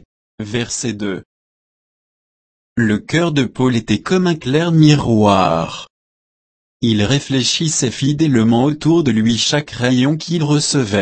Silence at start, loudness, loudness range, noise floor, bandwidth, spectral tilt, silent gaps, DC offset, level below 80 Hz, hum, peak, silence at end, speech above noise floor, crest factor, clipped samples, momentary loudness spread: 0.4 s; -15 LUFS; 6 LU; under -90 dBFS; 8.8 kHz; -5 dB/octave; 1.25-2.76 s, 5.90-6.80 s; under 0.1%; -46 dBFS; none; 0 dBFS; 0 s; over 75 dB; 16 dB; under 0.1%; 10 LU